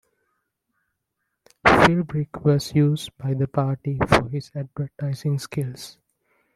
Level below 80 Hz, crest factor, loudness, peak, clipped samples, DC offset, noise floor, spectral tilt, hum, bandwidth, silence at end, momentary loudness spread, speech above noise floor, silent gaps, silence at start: -48 dBFS; 20 dB; -22 LUFS; -2 dBFS; under 0.1%; under 0.1%; -78 dBFS; -6.5 dB/octave; none; 13.5 kHz; 0.65 s; 14 LU; 55 dB; none; 1.65 s